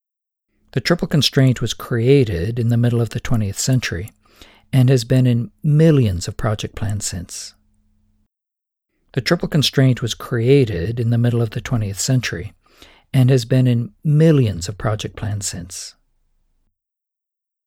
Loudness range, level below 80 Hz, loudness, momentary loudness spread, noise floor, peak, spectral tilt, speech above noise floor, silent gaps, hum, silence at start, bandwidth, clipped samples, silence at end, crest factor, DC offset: 4 LU; -40 dBFS; -18 LUFS; 12 LU; -84 dBFS; 0 dBFS; -6 dB/octave; 67 dB; none; none; 0.75 s; 16 kHz; under 0.1%; 1.75 s; 18 dB; under 0.1%